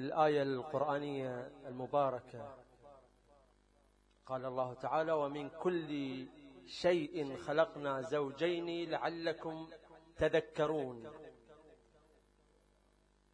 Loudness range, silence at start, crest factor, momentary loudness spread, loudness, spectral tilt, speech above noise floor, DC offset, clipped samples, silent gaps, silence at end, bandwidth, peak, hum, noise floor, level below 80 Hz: 5 LU; 0 s; 22 dB; 17 LU; -37 LUFS; -6.5 dB/octave; 34 dB; under 0.1%; under 0.1%; none; 1.6 s; 10.5 kHz; -18 dBFS; 50 Hz at -70 dBFS; -71 dBFS; -68 dBFS